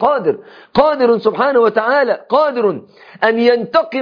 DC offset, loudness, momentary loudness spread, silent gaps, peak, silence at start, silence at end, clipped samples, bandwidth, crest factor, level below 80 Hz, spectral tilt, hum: under 0.1%; -14 LUFS; 7 LU; none; 0 dBFS; 0 s; 0 s; under 0.1%; 5.2 kHz; 14 dB; -52 dBFS; -7 dB/octave; none